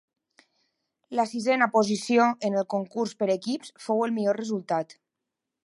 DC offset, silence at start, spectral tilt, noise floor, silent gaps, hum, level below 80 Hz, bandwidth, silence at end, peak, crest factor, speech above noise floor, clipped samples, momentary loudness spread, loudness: under 0.1%; 1.1 s; -5 dB/octave; -85 dBFS; none; none; -80 dBFS; 11.5 kHz; 0.8 s; -6 dBFS; 20 dB; 60 dB; under 0.1%; 9 LU; -26 LUFS